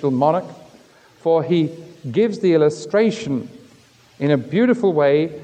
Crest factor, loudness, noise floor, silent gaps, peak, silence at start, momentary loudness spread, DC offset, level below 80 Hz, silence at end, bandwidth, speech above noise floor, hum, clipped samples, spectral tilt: 16 dB; -19 LUFS; -51 dBFS; none; -4 dBFS; 0 s; 10 LU; under 0.1%; -66 dBFS; 0 s; 9.2 kHz; 33 dB; none; under 0.1%; -7 dB/octave